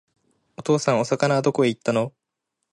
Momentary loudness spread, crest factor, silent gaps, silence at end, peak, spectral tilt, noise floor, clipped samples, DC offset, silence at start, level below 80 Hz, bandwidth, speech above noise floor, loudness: 7 LU; 18 dB; none; 0.65 s; -6 dBFS; -5.5 dB/octave; -80 dBFS; under 0.1%; under 0.1%; 0.6 s; -66 dBFS; 11.5 kHz; 59 dB; -22 LUFS